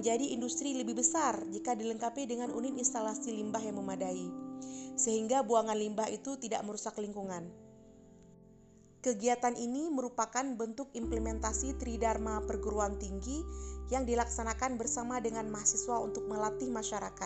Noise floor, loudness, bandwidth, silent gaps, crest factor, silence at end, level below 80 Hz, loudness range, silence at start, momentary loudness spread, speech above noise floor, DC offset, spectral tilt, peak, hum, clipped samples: -60 dBFS; -35 LUFS; 8.8 kHz; none; 22 dB; 0 s; -48 dBFS; 4 LU; 0 s; 9 LU; 25 dB; under 0.1%; -4 dB/octave; -14 dBFS; none; under 0.1%